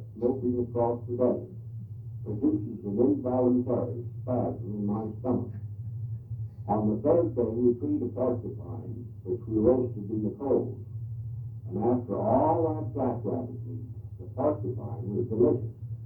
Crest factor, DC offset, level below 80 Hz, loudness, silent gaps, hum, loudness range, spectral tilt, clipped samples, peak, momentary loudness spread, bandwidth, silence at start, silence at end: 18 dB; under 0.1%; -54 dBFS; -29 LUFS; none; none; 2 LU; -13.5 dB/octave; under 0.1%; -10 dBFS; 14 LU; 2.7 kHz; 0 s; 0 s